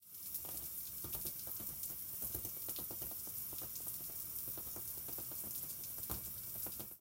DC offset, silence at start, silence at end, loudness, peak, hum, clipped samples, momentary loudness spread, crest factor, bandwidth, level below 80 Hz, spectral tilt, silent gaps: under 0.1%; 0 s; 0 s; -42 LUFS; -24 dBFS; none; under 0.1%; 2 LU; 22 dB; 17 kHz; -64 dBFS; -2 dB/octave; none